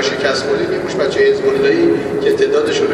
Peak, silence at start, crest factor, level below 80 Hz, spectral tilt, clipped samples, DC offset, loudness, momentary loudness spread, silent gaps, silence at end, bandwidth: -2 dBFS; 0 s; 14 dB; -48 dBFS; -4.5 dB/octave; under 0.1%; under 0.1%; -14 LUFS; 4 LU; none; 0 s; 11.5 kHz